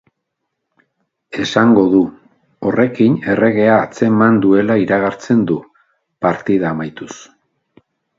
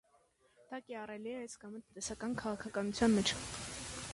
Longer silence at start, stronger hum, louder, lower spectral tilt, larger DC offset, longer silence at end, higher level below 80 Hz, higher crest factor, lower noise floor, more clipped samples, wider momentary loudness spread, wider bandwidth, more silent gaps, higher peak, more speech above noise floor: first, 1.3 s vs 0.6 s; neither; first, -14 LUFS vs -38 LUFS; first, -7 dB/octave vs -4 dB/octave; neither; first, 0.95 s vs 0 s; first, -54 dBFS vs -60 dBFS; about the same, 16 dB vs 20 dB; first, -75 dBFS vs -71 dBFS; neither; second, 12 LU vs 18 LU; second, 7.6 kHz vs 11.5 kHz; neither; first, 0 dBFS vs -18 dBFS; first, 61 dB vs 34 dB